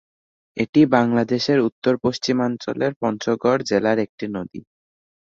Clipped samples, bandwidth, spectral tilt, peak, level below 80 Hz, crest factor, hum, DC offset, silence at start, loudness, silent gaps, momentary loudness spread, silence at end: under 0.1%; 7.6 kHz; -6 dB/octave; -2 dBFS; -58 dBFS; 18 dB; none; under 0.1%; 0.55 s; -20 LUFS; 0.69-0.73 s, 1.72-1.82 s, 2.96-3.01 s, 4.09-4.18 s; 13 LU; 0.6 s